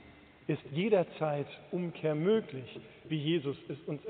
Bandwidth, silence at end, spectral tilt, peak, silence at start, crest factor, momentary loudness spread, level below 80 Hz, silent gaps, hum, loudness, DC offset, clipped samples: 4.5 kHz; 0 s; -6 dB/octave; -16 dBFS; 0 s; 18 dB; 15 LU; -72 dBFS; none; none; -34 LUFS; under 0.1%; under 0.1%